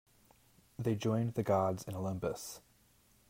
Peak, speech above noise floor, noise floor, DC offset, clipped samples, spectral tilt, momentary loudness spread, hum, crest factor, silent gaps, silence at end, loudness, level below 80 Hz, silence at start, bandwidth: -18 dBFS; 33 dB; -68 dBFS; under 0.1%; under 0.1%; -6.5 dB/octave; 15 LU; none; 18 dB; none; 0.7 s; -36 LUFS; -66 dBFS; 0.8 s; 16 kHz